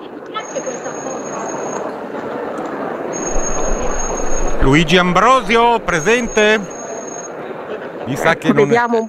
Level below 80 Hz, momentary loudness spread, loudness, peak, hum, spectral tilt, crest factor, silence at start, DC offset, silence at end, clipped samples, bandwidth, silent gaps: -26 dBFS; 15 LU; -17 LUFS; 0 dBFS; none; -4 dB/octave; 16 dB; 0 s; under 0.1%; 0 s; under 0.1%; 13.5 kHz; none